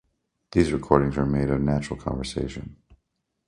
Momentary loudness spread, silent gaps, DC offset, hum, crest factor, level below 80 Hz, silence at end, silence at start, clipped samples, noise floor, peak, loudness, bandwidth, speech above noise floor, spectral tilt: 11 LU; none; under 0.1%; none; 24 dB; -40 dBFS; 0.75 s; 0.55 s; under 0.1%; -76 dBFS; -2 dBFS; -25 LUFS; 11 kHz; 52 dB; -7 dB/octave